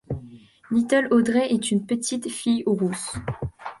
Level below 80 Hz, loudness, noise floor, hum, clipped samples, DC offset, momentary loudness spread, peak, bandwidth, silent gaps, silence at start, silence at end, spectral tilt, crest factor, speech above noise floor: -50 dBFS; -23 LUFS; -46 dBFS; none; under 0.1%; under 0.1%; 13 LU; -8 dBFS; 11.5 kHz; none; 0.1 s; 0.05 s; -5 dB/octave; 16 dB; 24 dB